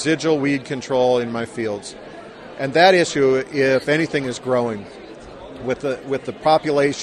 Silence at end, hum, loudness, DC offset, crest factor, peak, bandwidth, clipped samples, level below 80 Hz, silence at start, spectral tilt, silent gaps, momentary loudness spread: 0 s; none; -19 LUFS; under 0.1%; 18 dB; -2 dBFS; 12 kHz; under 0.1%; -54 dBFS; 0 s; -5 dB/octave; none; 22 LU